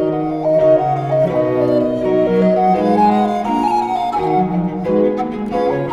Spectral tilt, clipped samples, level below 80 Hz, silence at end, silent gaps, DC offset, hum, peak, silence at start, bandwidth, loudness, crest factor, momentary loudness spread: -8.5 dB/octave; under 0.1%; -44 dBFS; 0 s; none; under 0.1%; none; -2 dBFS; 0 s; 11 kHz; -15 LUFS; 14 dB; 5 LU